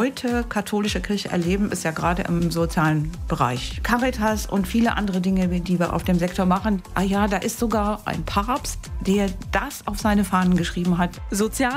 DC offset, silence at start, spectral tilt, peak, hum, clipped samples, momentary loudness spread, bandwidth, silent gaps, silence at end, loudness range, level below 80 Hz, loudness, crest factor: under 0.1%; 0 s; -5.5 dB/octave; -4 dBFS; none; under 0.1%; 4 LU; 16 kHz; none; 0 s; 1 LU; -34 dBFS; -23 LUFS; 18 dB